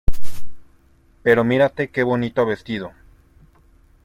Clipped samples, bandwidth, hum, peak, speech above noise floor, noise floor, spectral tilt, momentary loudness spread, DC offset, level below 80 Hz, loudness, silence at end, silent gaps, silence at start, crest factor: under 0.1%; 15 kHz; none; -2 dBFS; 35 dB; -54 dBFS; -7 dB/octave; 19 LU; under 0.1%; -34 dBFS; -20 LUFS; 1.15 s; none; 0.1 s; 16 dB